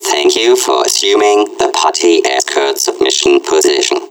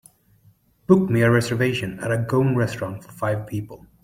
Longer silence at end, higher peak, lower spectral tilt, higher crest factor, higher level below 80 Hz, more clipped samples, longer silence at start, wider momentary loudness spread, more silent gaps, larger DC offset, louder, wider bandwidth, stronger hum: second, 0.05 s vs 0.3 s; about the same, 0 dBFS vs -2 dBFS; second, -0.5 dB/octave vs -7 dB/octave; second, 12 dB vs 20 dB; about the same, -54 dBFS vs -54 dBFS; neither; second, 0 s vs 0.9 s; second, 3 LU vs 14 LU; neither; neither; first, -11 LUFS vs -22 LUFS; first, 18 kHz vs 16 kHz; neither